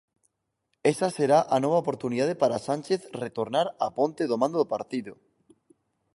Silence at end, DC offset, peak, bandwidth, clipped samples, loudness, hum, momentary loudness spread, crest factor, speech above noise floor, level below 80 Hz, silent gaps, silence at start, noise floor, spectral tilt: 1 s; under 0.1%; -8 dBFS; 11.5 kHz; under 0.1%; -26 LUFS; none; 10 LU; 20 dB; 52 dB; -70 dBFS; none; 0.85 s; -78 dBFS; -5.5 dB/octave